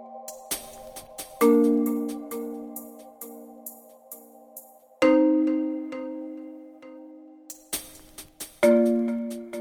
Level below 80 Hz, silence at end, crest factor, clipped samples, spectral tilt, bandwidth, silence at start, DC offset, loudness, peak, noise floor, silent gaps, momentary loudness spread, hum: -64 dBFS; 0 s; 20 dB; under 0.1%; -4.5 dB/octave; over 20 kHz; 0 s; under 0.1%; -24 LUFS; -8 dBFS; -48 dBFS; none; 25 LU; none